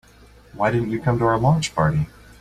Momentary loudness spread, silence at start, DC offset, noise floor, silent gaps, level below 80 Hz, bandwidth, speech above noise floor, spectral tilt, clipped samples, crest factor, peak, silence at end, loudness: 6 LU; 0.55 s; under 0.1%; -49 dBFS; none; -44 dBFS; 12 kHz; 29 dB; -6.5 dB/octave; under 0.1%; 16 dB; -6 dBFS; 0.35 s; -21 LUFS